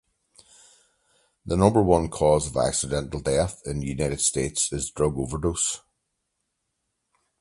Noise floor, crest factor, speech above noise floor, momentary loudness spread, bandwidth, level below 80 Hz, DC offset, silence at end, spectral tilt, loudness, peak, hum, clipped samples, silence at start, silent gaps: -78 dBFS; 24 dB; 55 dB; 8 LU; 11.5 kHz; -42 dBFS; under 0.1%; 1.6 s; -4.5 dB/octave; -24 LUFS; -2 dBFS; none; under 0.1%; 1.45 s; none